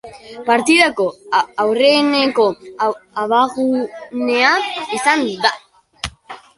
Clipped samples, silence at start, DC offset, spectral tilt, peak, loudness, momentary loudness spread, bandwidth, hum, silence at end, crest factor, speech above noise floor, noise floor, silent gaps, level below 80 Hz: under 0.1%; 0.05 s; under 0.1%; -3 dB/octave; 0 dBFS; -16 LUFS; 14 LU; 11.5 kHz; none; 0.2 s; 16 dB; 21 dB; -37 dBFS; none; -52 dBFS